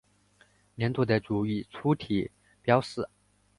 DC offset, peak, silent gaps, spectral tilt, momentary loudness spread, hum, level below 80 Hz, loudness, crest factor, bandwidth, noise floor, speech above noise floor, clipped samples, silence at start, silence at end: under 0.1%; -8 dBFS; none; -7.5 dB/octave; 12 LU; 50 Hz at -50 dBFS; -58 dBFS; -29 LUFS; 22 dB; 11.5 kHz; -64 dBFS; 36 dB; under 0.1%; 0.8 s; 0.5 s